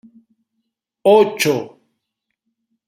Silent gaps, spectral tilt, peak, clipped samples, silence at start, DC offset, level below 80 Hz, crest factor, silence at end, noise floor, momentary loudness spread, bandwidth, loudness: none; -4 dB/octave; 0 dBFS; under 0.1%; 1.05 s; under 0.1%; -66 dBFS; 20 dB; 1.2 s; -77 dBFS; 12 LU; 16 kHz; -15 LUFS